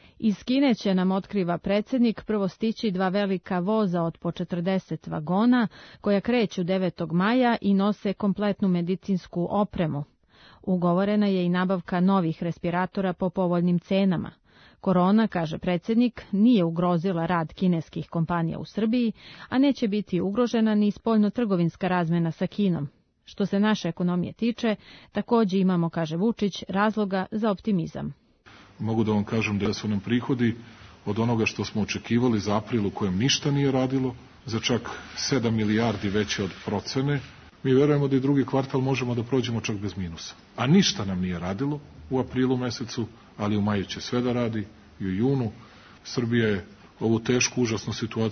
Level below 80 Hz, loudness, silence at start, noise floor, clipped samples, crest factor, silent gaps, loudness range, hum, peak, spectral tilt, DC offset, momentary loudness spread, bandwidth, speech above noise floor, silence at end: -56 dBFS; -25 LUFS; 0.2 s; -55 dBFS; under 0.1%; 16 dB; none; 3 LU; none; -8 dBFS; -6 dB/octave; under 0.1%; 9 LU; 6.6 kHz; 30 dB; 0 s